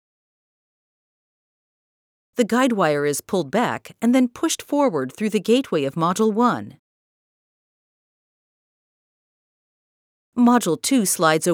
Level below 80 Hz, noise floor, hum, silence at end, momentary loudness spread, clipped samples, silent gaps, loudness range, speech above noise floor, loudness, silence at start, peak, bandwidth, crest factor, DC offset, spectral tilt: -70 dBFS; under -90 dBFS; none; 0 s; 7 LU; under 0.1%; 6.79-10.32 s; 5 LU; over 70 dB; -20 LUFS; 2.35 s; -2 dBFS; 18.5 kHz; 20 dB; under 0.1%; -4.5 dB/octave